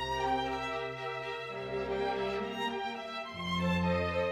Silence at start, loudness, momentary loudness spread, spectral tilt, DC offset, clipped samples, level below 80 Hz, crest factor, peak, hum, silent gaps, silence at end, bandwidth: 0 s; -34 LUFS; 7 LU; -6 dB/octave; under 0.1%; under 0.1%; -56 dBFS; 14 dB; -20 dBFS; none; none; 0 s; 13 kHz